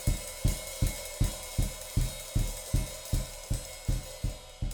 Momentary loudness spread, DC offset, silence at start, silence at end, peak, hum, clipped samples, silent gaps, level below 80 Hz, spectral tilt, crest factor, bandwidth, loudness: 4 LU; under 0.1%; 0 s; 0 s; -14 dBFS; none; under 0.1%; none; -34 dBFS; -4.5 dB/octave; 18 dB; over 20 kHz; -34 LUFS